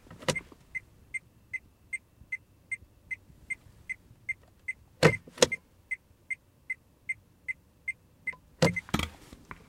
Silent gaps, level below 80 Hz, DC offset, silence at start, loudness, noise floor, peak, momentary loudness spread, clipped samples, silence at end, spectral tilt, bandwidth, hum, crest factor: none; -56 dBFS; under 0.1%; 0.1 s; -34 LUFS; -50 dBFS; 0 dBFS; 14 LU; under 0.1%; 0.15 s; -4 dB/octave; 16.5 kHz; none; 34 dB